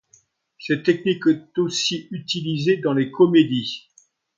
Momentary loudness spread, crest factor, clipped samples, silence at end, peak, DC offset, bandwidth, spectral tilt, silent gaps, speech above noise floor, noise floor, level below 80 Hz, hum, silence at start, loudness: 12 LU; 18 dB; under 0.1%; 0.6 s; -4 dBFS; under 0.1%; 7.6 kHz; -5 dB/octave; none; 39 dB; -59 dBFS; -66 dBFS; none; 0.6 s; -21 LUFS